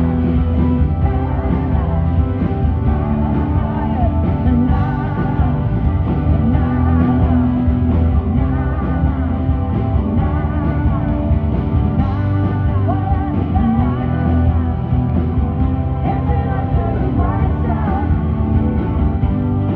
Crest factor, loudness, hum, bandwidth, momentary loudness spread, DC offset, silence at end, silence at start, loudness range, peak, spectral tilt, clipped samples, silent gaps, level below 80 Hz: 14 dB; -17 LUFS; none; 4.1 kHz; 3 LU; under 0.1%; 0 s; 0 s; 2 LU; -2 dBFS; -12 dB/octave; under 0.1%; none; -20 dBFS